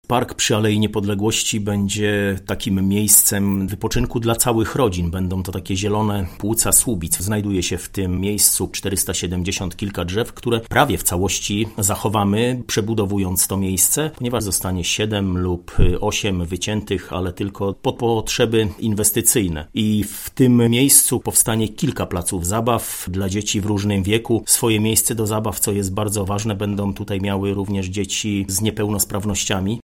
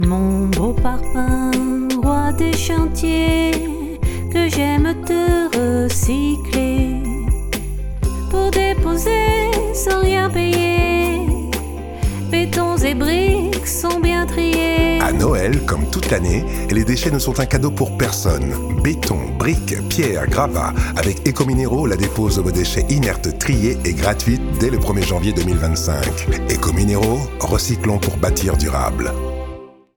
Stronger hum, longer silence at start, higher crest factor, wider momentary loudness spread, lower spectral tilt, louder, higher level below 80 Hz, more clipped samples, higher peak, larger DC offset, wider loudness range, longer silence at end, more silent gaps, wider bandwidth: neither; about the same, 0.1 s vs 0 s; about the same, 20 dB vs 16 dB; first, 9 LU vs 5 LU; second, -4 dB/octave vs -5.5 dB/octave; about the same, -19 LUFS vs -18 LUFS; second, -34 dBFS vs -24 dBFS; neither; about the same, 0 dBFS vs -2 dBFS; neither; first, 5 LU vs 2 LU; second, 0.05 s vs 0.25 s; neither; second, 17 kHz vs over 20 kHz